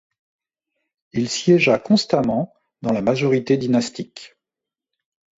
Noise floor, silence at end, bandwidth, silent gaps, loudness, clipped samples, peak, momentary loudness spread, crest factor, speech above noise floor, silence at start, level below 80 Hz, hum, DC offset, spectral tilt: -87 dBFS; 1.1 s; 8 kHz; none; -19 LUFS; under 0.1%; -4 dBFS; 14 LU; 18 dB; 69 dB; 1.15 s; -58 dBFS; none; under 0.1%; -5.5 dB/octave